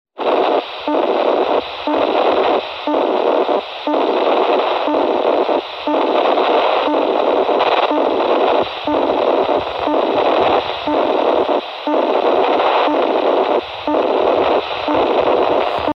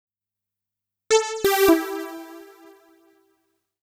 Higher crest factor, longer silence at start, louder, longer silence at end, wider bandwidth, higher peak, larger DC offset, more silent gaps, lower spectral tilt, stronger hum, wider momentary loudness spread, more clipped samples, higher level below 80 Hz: second, 14 dB vs 22 dB; second, 0.15 s vs 1.1 s; first, -16 LUFS vs -21 LUFS; second, 0.05 s vs 1.4 s; second, 6.6 kHz vs 17 kHz; about the same, -2 dBFS vs -4 dBFS; neither; neither; first, -5.5 dB/octave vs -2.5 dB/octave; neither; second, 4 LU vs 20 LU; neither; first, -52 dBFS vs -58 dBFS